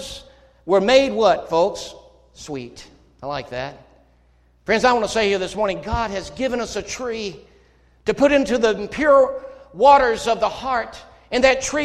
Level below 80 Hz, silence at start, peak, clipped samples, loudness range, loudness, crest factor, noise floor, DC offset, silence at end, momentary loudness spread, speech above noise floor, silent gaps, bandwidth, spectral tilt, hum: -44 dBFS; 0 s; -2 dBFS; under 0.1%; 7 LU; -19 LUFS; 20 dB; -56 dBFS; under 0.1%; 0 s; 19 LU; 38 dB; none; 12.5 kHz; -4 dB/octave; none